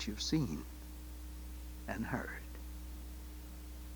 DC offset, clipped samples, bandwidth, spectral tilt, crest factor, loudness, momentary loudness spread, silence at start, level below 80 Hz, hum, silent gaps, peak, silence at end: under 0.1%; under 0.1%; over 20 kHz; -4.5 dB/octave; 20 dB; -43 LUFS; 14 LU; 0 s; -48 dBFS; none; none; -22 dBFS; 0 s